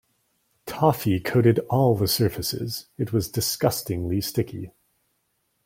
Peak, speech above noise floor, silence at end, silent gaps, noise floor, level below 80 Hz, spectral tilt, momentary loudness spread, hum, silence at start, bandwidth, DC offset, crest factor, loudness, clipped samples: -6 dBFS; 49 dB; 0.95 s; none; -72 dBFS; -52 dBFS; -5.5 dB/octave; 12 LU; none; 0.65 s; 16.5 kHz; under 0.1%; 20 dB; -24 LUFS; under 0.1%